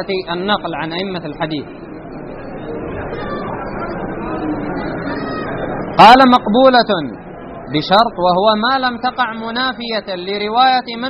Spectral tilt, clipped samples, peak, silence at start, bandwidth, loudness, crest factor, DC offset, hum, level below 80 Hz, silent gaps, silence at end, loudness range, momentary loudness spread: -2.5 dB/octave; 0.2%; 0 dBFS; 0 s; 6 kHz; -15 LUFS; 16 dB; under 0.1%; none; -40 dBFS; none; 0 s; 13 LU; 18 LU